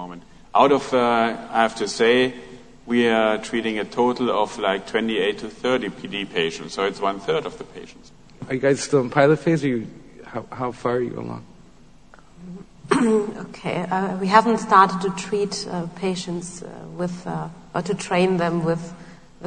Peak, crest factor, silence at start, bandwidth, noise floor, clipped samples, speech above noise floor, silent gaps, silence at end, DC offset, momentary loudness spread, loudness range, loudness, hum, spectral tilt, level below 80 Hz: 0 dBFS; 22 dB; 0 s; 9.6 kHz; -50 dBFS; under 0.1%; 29 dB; none; 0 s; 0.3%; 17 LU; 6 LU; -22 LUFS; none; -5 dB/octave; -54 dBFS